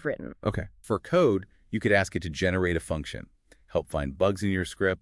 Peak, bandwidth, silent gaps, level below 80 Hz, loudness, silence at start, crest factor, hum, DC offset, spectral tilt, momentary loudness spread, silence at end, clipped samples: -10 dBFS; 12 kHz; none; -48 dBFS; -28 LUFS; 0 s; 18 dB; none; under 0.1%; -6 dB/octave; 10 LU; 0.05 s; under 0.1%